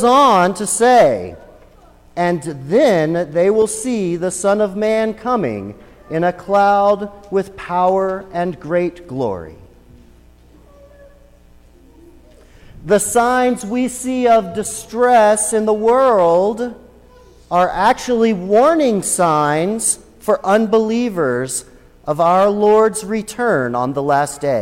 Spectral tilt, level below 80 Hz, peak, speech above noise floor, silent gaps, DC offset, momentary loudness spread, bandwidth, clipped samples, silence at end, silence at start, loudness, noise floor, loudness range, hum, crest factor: -4.5 dB/octave; -48 dBFS; -2 dBFS; 31 dB; none; under 0.1%; 11 LU; 16.5 kHz; under 0.1%; 0 s; 0 s; -16 LUFS; -46 dBFS; 7 LU; 60 Hz at -50 dBFS; 14 dB